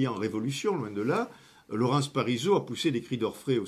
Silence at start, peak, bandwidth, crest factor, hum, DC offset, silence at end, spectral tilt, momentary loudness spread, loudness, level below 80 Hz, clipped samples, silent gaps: 0 s; -12 dBFS; 15.5 kHz; 16 dB; none; under 0.1%; 0 s; -6 dB/octave; 5 LU; -29 LUFS; -68 dBFS; under 0.1%; none